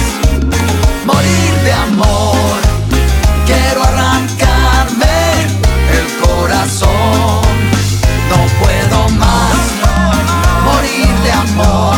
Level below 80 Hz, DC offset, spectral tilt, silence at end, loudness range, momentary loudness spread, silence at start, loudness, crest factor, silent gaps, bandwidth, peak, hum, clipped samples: -14 dBFS; under 0.1%; -5 dB/octave; 0 s; 1 LU; 2 LU; 0 s; -11 LUFS; 10 dB; none; 19.5 kHz; 0 dBFS; none; under 0.1%